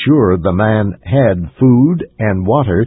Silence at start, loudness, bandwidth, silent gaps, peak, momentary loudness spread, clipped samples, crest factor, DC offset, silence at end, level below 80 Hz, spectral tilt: 0 s; -13 LUFS; 4 kHz; none; 0 dBFS; 6 LU; under 0.1%; 12 dB; under 0.1%; 0 s; -32 dBFS; -13 dB/octave